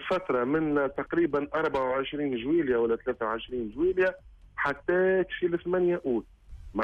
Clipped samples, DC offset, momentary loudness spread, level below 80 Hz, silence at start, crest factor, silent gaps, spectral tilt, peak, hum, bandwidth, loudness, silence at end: under 0.1%; under 0.1%; 6 LU; -54 dBFS; 0 s; 14 dB; none; -7.5 dB/octave; -14 dBFS; none; 5.8 kHz; -28 LUFS; 0 s